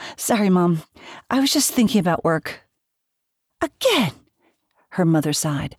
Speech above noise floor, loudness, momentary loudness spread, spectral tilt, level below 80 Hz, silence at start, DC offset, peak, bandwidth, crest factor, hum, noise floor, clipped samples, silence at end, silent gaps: 58 dB; -20 LUFS; 11 LU; -4.5 dB/octave; -56 dBFS; 0 s; under 0.1%; -6 dBFS; 17 kHz; 16 dB; none; -77 dBFS; under 0.1%; 0.1 s; none